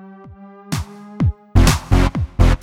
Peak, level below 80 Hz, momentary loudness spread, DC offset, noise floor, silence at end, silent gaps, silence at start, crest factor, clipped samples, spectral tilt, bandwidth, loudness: 0 dBFS; -20 dBFS; 11 LU; under 0.1%; -40 dBFS; 0.05 s; none; 0.05 s; 16 dB; under 0.1%; -5.5 dB/octave; 16 kHz; -18 LUFS